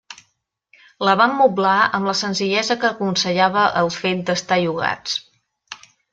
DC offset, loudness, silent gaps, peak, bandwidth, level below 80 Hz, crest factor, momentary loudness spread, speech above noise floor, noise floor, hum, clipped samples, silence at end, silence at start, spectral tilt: under 0.1%; -18 LUFS; none; -2 dBFS; 9.2 kHz; -62 dBFS; 18 dB; 10 LU; 51 dB; -69 dBFS; none; under 0.1%; 0.35 s; 0.1 s; -4 dB/octave